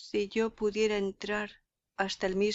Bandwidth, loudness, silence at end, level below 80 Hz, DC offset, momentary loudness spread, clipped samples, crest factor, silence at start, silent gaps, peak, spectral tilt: 8 kHz; -32 LUFS; 0 s; -58 dBFS; under 0.1%; 6 LU; under 0.1%; 18 dB; 0 s; none; -14 dBFS; -4.5 dB/octave